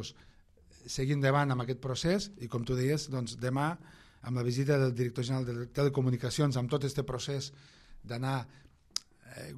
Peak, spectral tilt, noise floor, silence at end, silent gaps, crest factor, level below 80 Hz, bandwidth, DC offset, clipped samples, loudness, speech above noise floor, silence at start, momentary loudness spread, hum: -12 dBFS; -6 dB/octave; -60 dBFS; 0 s; none; 22 dB; -56 dBFS; 13 kHz; under 0.1%; under 0.1%; -33 LUFS; 28 dB; 0 s; 13 LU; none